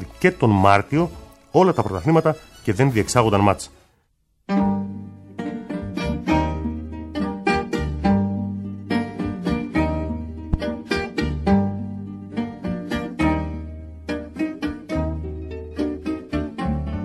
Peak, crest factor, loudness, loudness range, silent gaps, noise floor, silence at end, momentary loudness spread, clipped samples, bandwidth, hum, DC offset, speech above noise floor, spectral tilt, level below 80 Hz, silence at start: 0 dBFS; 22 dB; -23 LUFS; 7 LU; none; -65 dBFS; 0 s; 13 LU; under 0.1%; 13.5 kHz; none; under 0.1%; 47 dB; -6.5 dB/octave; -36 dBFS; 0 s